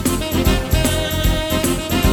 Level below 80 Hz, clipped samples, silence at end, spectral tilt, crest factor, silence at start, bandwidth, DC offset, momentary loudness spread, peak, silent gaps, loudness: -22 dBFS; under 0.1%; 0 s; -4.5 dB/octave; 14 dB; 0 s; over 20 kHz; under 0.1%; 1 LU; -2 dBFS; none; -18 LUFS